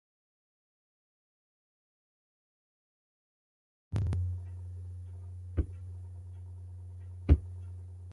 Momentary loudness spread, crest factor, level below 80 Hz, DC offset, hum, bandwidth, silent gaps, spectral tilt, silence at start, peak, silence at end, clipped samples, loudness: 18 LU; 28 dB; -40 dBFS; under 0.1%; none; 5 kHz; none; -9.5 dB/octave; 3.9 s; -10 dBFS; 0 s; under 0.1%; -37 LUFS